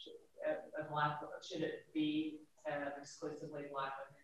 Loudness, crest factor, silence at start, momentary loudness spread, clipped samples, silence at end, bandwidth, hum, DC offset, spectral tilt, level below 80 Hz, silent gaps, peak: -43 LUFS; 20 dB; 0 s; 9 LU; under 0.1%; 0.05 s; 11.5 kHz; none; under 0.1%; -5.5 dB/octave; -84 dBFS; none; -24 dBFS